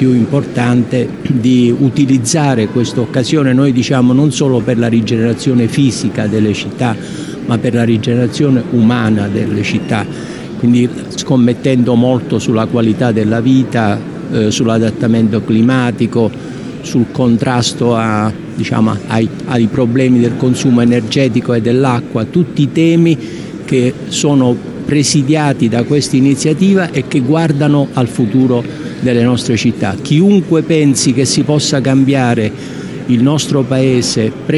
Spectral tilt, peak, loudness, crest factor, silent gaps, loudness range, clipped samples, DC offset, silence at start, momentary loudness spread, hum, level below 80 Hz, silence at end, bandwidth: -6 dB/octave; 0 dBFS; -12 LUFS; 10 dB; none; 2 LU; under 0.1%; under 0.1%; 0 s; 6 LU; none; -46 dBFS; 0 s; 12 kHz